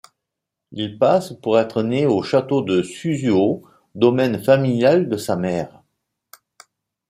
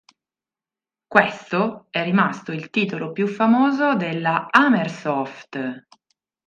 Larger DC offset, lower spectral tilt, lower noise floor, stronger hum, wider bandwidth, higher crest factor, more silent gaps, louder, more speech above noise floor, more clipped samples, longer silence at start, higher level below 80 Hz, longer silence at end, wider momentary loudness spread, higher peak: neither; about the same, -6.5 dB/octave vs -6.5 dB/octave; second, -82 dBFS vs under -90 dBFS; neither; first, 15.5 kHz vs 7.6 kHz; about the same, 18 dB vs 22 dB; neither; about the same, -19 LUFS vs -21 LUFS; second, 64 dB vs over 70 dB; neither; second, 0.7 s vs 1.1 s; first, -62 dBFS vs -70 dBFS; first, 1.4 s vs 0.7 s; second, 10 LU vs 13 LU; about the same, -2 dBFS vs 0 dBFS